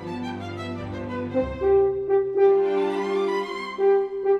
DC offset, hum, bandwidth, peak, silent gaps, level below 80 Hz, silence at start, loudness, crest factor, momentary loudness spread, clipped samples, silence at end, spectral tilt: under 0.1%; none; 7.6 kHz; -10 dBFS; none; -48 dBFS; 0 s; -24 LUFS; 12 dB; 13 LU; under 0.1%; 0 s; -7 dB/octave